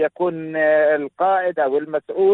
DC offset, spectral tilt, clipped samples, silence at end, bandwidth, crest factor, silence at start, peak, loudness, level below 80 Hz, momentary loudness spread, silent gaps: under 0.1%; -9 dB/octave; under 0.1%; 0 s; 4.1 kHz; 12 dB; 0 s; -8 dBFS; -19 LUFS; -66 dBFS; 7 LU; none